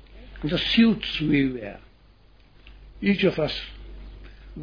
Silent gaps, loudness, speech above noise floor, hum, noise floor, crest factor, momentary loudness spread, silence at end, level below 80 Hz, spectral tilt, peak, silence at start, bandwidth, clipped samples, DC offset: none; -23 LUFS; 32 dB; none; -54 dBFS; 18 dB; 25 LU; 0 s; -44 dBFS; -7 dB/octave; -8 dBFS; 0.1 s; 5.2 kHz; under 0.1%; under 0.1%